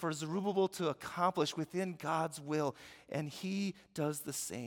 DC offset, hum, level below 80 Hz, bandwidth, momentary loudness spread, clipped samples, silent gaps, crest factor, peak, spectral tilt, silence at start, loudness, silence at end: under 0.1%; none; -78 dBFS; 18 kHz; 7 LU; under 0.1%; none; 18 dB; -18 dBFS; -5 dB/octave; 0 s; -37 LUFS; 0 s